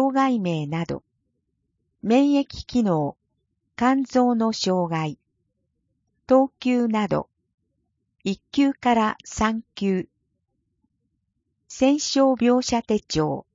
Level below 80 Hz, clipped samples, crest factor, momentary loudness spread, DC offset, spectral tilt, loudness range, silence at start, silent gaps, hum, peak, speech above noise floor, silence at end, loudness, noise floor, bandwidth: -52 dBFS; under 0.1%; 18 dB; 11 LU; under 0.1%; -5.5 dB/octave; 3 LU; 0 s; 7.54-7.58 s; none; -6 dBFS; 54 dB; 0.15 s; -22 LUFS; -75 dBFS; 7.6 kHz